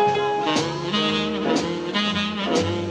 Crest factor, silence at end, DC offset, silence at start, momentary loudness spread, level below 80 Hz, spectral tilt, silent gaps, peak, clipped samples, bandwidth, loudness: 14 dB; 0 s; under 0.1%; 0 s; 3 LU; -54 dBFS; -4.5 dB/octave; none; -8 dBFS; under 0.1%; 11 kHz; -22 LUFS